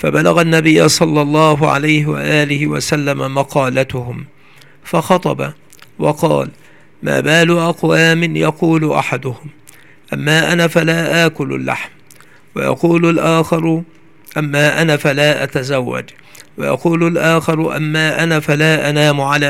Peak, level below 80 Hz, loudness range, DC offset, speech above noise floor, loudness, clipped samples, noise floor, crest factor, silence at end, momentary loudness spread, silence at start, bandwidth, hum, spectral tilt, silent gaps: 0 dBFS; -52 dBFS; 4 LU; 0.6%; 32 dB; -14 LUFS; under 0.1%; -45 dBFS; 14 dB; 0 s; 11 LU; 0 s; 16 kHz; none; -5 dB/octave; none